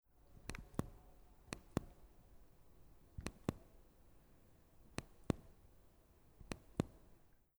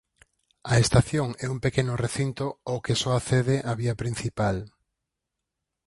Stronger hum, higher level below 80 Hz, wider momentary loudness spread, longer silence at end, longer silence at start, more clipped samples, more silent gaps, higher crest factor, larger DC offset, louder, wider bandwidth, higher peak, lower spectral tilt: neither; second, -60 dBFS vs -46 dBFS; first, 24 LU vs 9 LU; second, 0.2 s vs 1.2 s; second, 0.1 s vs 0.65 s; neither; neither; first, 32 dB vs 22 dB; neither; second, -49 LUFS vs -26 LUFS; first, over 20 kHz vs 11.5 kHz; second, -18 dBFS vs -6 dBFS; about the same, -6 dB/octave vs -5.5 dB/octave